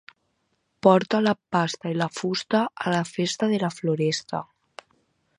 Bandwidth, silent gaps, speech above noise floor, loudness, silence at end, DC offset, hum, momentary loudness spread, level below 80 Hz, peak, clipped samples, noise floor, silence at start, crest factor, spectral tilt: 11 kHz; none; 49 dB; -24 LUFS; 0.95 s; under 0.1%; none; 9 LU; -70 dBFS; -2 dBFS; under 0.1%; -73 dBFS; 0.85 s; 22 dB; -5.5 dB/octave